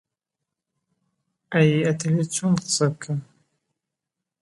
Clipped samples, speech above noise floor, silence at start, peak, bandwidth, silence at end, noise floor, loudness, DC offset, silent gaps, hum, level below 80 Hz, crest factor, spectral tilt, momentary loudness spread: under 0.1%; 64 dB; 1.5 s; -6 dBFS; 11.5 kHz; 1.2 s; -85 dBFS; -22 LUFS; under 0.1%; none; none; -66 dBFS; 20 dB; -5 dB/octave; 11 LU